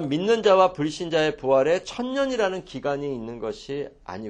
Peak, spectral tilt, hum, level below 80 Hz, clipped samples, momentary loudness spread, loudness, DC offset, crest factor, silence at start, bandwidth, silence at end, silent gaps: -4 dBFS; -5 dB/octave; none; -54 dBFS; under 0.1%; 14 LU; -24 LUFS; under 0.1%; 20 dB; 0 s; 9.6 kHz; 0 s; none